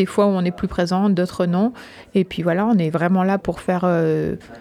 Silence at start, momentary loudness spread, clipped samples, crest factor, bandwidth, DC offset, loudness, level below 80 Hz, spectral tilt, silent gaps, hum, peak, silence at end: 0 s; 5 LU; under 0.1%; 14 dB; 12 kHz; under 0.1%; -20 LUFS; -46 dBFS; -7.5 dB/octave; none; none; -6 dBFS; 0 s